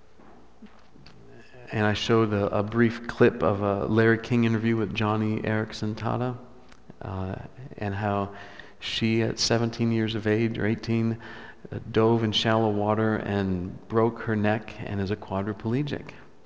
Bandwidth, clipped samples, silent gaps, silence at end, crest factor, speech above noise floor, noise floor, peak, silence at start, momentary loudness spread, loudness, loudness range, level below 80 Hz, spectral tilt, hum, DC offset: 8 kHz; under 0.1%; none; 0.2 s; 20 dB; 28 dB; -53 dBFS; -6 dBFS; 0.6 s; 14 LU; -26 LUFS; 7 LU; -50 dBFS; -6 dB/octave; none; 0.4%